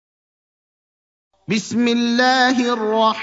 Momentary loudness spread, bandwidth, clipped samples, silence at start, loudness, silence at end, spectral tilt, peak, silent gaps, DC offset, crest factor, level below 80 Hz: 8 LU; 7.8 kHz; under 0.1%; 1.5 s; -17 LUFS; 0 s; -4 dB/octave; -2 dBFS; none; under 0.1%; 16 dB; -68 dBFS